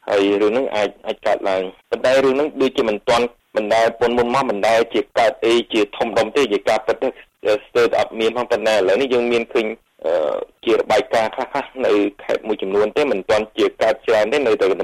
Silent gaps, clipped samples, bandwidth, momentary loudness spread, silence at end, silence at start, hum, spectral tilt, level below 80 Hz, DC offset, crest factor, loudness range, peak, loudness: none; under 0.1%; 14 kHz; 7 LU; 0 s; 0.05 s; none; -4 dB/octave; -52 dBFS; under 0.1%; 10 dB; 2 LU; -8 dBFS; -18 LUFS